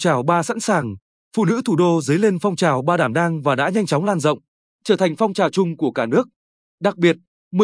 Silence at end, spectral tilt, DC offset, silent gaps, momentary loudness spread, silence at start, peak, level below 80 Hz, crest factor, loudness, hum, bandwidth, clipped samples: 0 s; -6 dB/octave; under 0.1%; 1.02-1.31 s, 4.48-4.79 s, 6.36-6.78 s, 7.27-7.51 s; 9 LU; 0 s; -2 dBFS; -68 dBFS; 16 dB; -19 LUFS; none; 10.5 kHz; under 0.1%